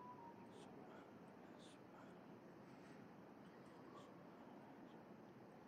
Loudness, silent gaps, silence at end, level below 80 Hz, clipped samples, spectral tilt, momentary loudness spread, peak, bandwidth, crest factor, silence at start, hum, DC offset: -61 LUFS; none; 0 s; under -90 dBFS; under 0.1%; -6 dB/octave; 2 LU; -48 dBFS; 13.5 kHz; 14 dB; 0 s; none; under 0.1%